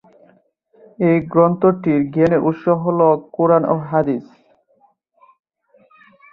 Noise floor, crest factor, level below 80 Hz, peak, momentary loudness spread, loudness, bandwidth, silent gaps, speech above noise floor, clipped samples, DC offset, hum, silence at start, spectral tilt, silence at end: -59 dBFS; 16 dB; -56 dBFS; -2 dBFS; 5 LU; -16 LUFS; 5.2 kHz; none; 43 dB; under 0.1%; under 0.1%; none; 1 s; -11 dB/octave; 2.1 s